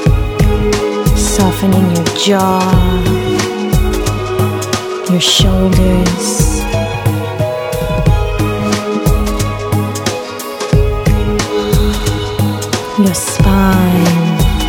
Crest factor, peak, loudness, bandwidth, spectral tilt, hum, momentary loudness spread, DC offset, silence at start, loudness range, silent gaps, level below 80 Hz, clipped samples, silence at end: 12 dB; 0 dBFS; -13 LUFS; 19.5 kHz; -5 dB/octave; none; 6 LU; under 0.1%; 0 s; 3 LU; none; -18 dBFS; under 0.1%; 0 s